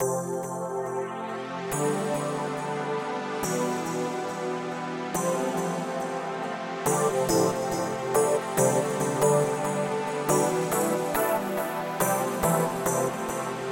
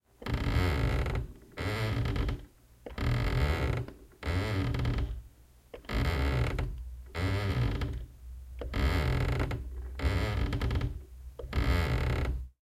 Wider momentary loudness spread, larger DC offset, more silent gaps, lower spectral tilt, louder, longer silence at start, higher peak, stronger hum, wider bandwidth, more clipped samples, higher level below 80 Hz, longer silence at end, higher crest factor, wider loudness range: second, 8 LU vs 15 LU; neither; neither; second, -4.5 dB/octave vs -6.5 dB/octave; first, -27 LUFS vs -33 LUFS; second, 0 s vs 0.2 s; first, -8 dBFS vs -16 dBFS; neither; first, 17 kHz vs 15 kHz; neither; second, -58 dBFS vs -36 dBFS; about the same, 0 s vs 0.1 s; about the same, 18 dB vs 16 dB; first, 5 LU vs 1 LU